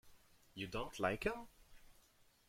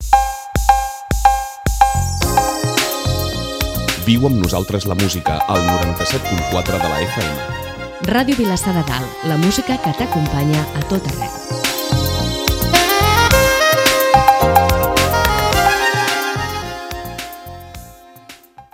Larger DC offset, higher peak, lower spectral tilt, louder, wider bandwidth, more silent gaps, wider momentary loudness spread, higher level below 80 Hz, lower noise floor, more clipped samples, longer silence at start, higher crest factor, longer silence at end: neither; second, -22 dBFS vs 0 dBFS; about the same, -5 dB/octave vs -4 dB/octave; second, -43 LUFS vs -16 LUFS; about the same, 16.5 kHz vs 17.5 kHz; neither; first, 18 LU vs 12 LU; second, -62 dBFS vs -28 dBFS; first, -70 dBFS vs -41 dBFS; neither; about the same, 0.05 s vs 0 s; first, 24 dB vs 16 dB; first, 0.55 s vs 0.1 s